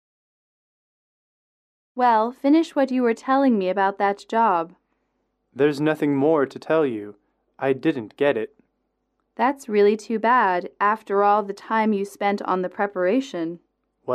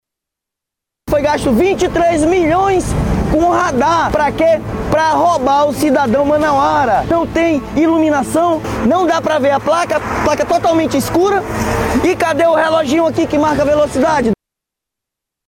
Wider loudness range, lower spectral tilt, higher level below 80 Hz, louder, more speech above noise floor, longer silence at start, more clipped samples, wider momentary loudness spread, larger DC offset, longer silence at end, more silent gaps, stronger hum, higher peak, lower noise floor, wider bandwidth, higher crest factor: about the same, 3 LU vs 1 LU; about the same, -6.5 dB/octave vs -5.5 dB/octave; second, -74 dBFS vs -32 dBFS; second, -22 LUFS vs -13 LUFS; second, 53 dB vs 69 dB; first, 1.95 s vs 1.05 s; neither; first, 9 LU vs 4 LU; neither; second, 0 s vs 1.15 s; neither; neither; second, -8 dBFS vs -4 dBFS; second, -74 dBFS vs -82 dBFS; second, 13 kHz vs 17.5 kHz; first, 16 dB vs 10 dB